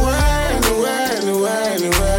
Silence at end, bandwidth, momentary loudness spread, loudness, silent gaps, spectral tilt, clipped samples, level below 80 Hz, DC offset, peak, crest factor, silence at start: 0 s; 17 kHz; 2 LU; -18 LUFS; none; -4 dB/octave; under 0.1%; -22 dBFS; under 0.1%; -2 dBFS; 14 dB; 0 s